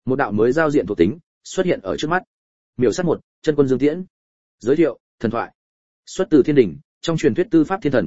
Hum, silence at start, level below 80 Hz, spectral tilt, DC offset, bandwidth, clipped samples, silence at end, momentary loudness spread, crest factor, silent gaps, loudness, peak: none; 0 s; -50 dBFS; -6.5 dB/octave; 0.9%; 8 kHz; under 0.1%; 0 s; 11 LU; 18 dB; 1.23-1.41 s, 2.27-2.73 s, 3.24-3.42 s, 4.10-4.58 s, 5.00-5.18 s, 5.55-6.03 s, 6.84-7.01 s; -19 LUFS; -2 dBFS